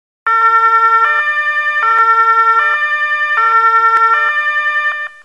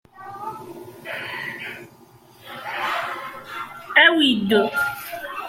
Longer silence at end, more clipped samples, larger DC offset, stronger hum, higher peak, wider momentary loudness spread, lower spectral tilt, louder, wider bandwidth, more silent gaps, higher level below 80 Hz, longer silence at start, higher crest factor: first, 0.15 s vs 0 s; neither; first, 0.3% vs under 0.1%; neither; about the same, -2 dBFS vs -2 dBFS; second, 4 LU vs 23 LU; second, 0.5 dB/octave vs -4 dB/octave; first, -10 LUFS vs -20 LUFS; second, 9.4 kHz vs 16.5 kHz; neither; about the same, -62 dBFS vs -64 dBFS; about the same, 0.25 s vs 0.15 s; second, 10 dB vs 22 dB